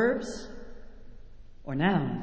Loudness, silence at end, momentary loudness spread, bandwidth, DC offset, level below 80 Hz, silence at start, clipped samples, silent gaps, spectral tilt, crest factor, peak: -30 LUFS; 0 s; 22 LU; 8 kHz; under 0.1%; -50 dBFS; 0 s; under 0.1%; none; -6.5 dB/octave; 18 dB; -14 dBFS